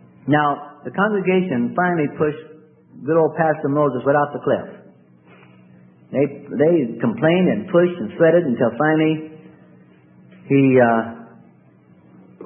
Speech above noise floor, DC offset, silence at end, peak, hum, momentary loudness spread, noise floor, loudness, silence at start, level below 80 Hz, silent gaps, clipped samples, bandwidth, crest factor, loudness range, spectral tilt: 33 dB; under 0.1%; 0 s; -2 dBFS; none; 11 LU; -51 dBFS; -18 LUFS; 0.25 s; -64 dBFS; none; under 0.1%; 3.6 kHz; 18 dB; 4 LU; -12.5 dB/octave